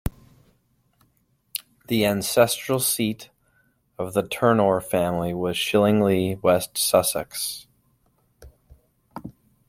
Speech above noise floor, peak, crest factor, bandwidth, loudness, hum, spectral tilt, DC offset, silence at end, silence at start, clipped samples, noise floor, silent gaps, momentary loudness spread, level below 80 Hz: 45 dB; -2 dBFS; 22 dB; 16.5 kHz; -22 LUFS; none; -4 dB/octave; under 0.1%; 0.4 s; 0.05 s; under 0.1%; -66 dBFS; none; 17 LU; -50 dBFS